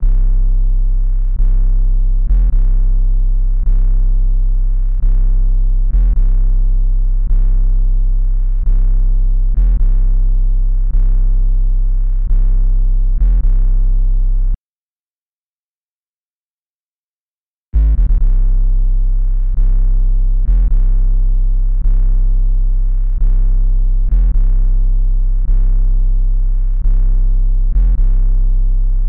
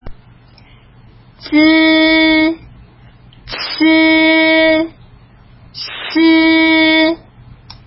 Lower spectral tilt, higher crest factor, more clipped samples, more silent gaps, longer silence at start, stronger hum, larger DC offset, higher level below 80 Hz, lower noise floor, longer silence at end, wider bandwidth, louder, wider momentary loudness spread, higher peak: first, -11 dB/octave vs -8 dB/octave; second, 6 dB vs 14 dB; neither; first, 14.58-17.72 s vs none; about the same, 0 s vs 0.05 s; neither; neither; first, -10 dBFS vs -44 dBFS; first, under -90 dBFS vs -43 dBFS; second, 0 s vs 0.7 s; second, 0.9 kHz vs 5.8 kHz; second, -18 LUFS vs -10 LUFS; second, 3 LU vs 16 LU; second, -4 dBFS vs 0 dBFS